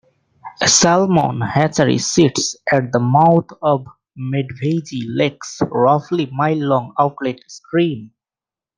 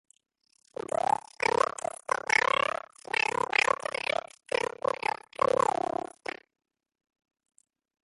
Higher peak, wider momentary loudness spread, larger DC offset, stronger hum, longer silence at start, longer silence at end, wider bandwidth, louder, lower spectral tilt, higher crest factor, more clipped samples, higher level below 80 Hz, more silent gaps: first, 0 dBFS vs -8 dBFS; second, 10 LU vs 13 LU; neither; neither; second, 0.45 s vs 1.1 s; second, 0.7 s vs 2.4 s; second, 10 kHz vs 11.5 kHz; first, -17 LUFS vs -29 LUFS; first, -4.5 dB/octave vs -2 dB/octave; second, 16 dB vs 22 dB; neither; first, -54 dBFS vs -68 dBFS; neither